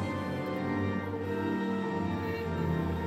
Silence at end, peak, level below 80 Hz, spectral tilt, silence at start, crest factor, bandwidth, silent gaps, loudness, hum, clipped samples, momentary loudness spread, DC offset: 0 s; -20 dBFS; -56 dBFS; -8 dB/octave; 0 s; 12 dB; 16 kHz; none; -33 LUFS; none; under 0.1%; 3 LU; under 0.1%